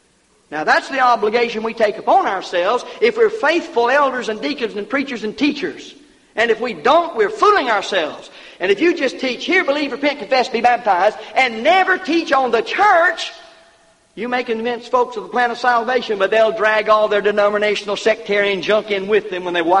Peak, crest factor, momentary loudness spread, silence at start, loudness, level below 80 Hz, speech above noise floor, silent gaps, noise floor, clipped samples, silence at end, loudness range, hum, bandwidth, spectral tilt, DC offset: -2 dBFS; 14 dB; 8 LU; 0.5 s; -17 LUFS; -58 dBFS; 40 dB; none; -56 dBFS; under 0.1%; 0 s; 3 LU; none; 11 kHz; -3.5 dB/octave; under 0.1%